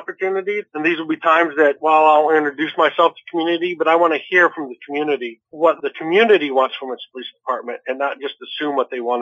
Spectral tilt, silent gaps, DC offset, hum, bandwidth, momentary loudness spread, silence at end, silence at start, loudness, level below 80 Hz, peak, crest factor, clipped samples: -5.5 dB/octave; none; under 0.1%; none; 7.6 kHz; 13 LU; 0 s; 0 s; -17 LUFS; -82 dBFS; -2 dBFS; 14 dB; under 0.1%